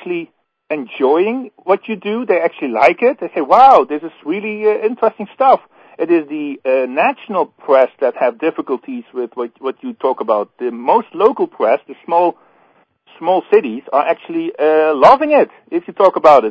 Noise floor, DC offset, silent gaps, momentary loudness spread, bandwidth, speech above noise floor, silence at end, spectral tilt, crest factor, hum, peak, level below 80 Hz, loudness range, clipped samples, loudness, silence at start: -54 dBFS; under 0.1%; none; 14 LU; 8 kHz; 40 dB; 0 s; -6.5 dB/octave; 14 dB; none; 0 dBFS; -62 dBFS; 5 LU; 0.3%; -15 LUFS; 0.05 s